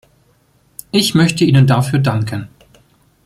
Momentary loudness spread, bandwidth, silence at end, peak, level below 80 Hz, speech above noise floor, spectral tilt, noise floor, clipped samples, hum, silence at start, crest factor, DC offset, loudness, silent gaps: 17 LU; 15 kHz; 0.8 s; 0 dBFS; -48 dBFS; 42 dB; -5.5 dB/octave; -55 dBFS; under 0.1%; none; 0.95 s; 16 dB; under 0.1%; -14 LUFS; none